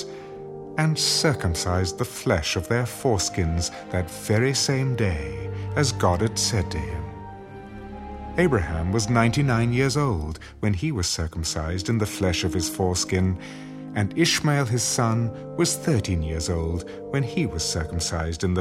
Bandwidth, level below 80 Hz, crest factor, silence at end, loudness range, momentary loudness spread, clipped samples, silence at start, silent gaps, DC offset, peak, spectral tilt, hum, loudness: 16 kHz; -40 dBFS; 20 dB; 0 s; 2 LU; 12 LU; under 0.1%; 0 s; none; under 0.1%; -4 dBFS; -4.5 dB/octave; none; -24 LUFS